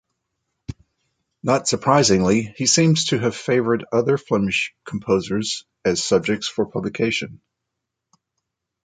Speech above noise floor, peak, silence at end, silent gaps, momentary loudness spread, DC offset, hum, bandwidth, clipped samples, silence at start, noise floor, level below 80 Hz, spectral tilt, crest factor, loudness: 61 dB; -2 dBFS; 1.5 s; none; 12 LU; under 0.1%; none; 9.6 kHz; under 0.1%; 0.7 s; -81 dBFS; -52 dBFS; -4 dB/octave; 20 dB; -20 LUFS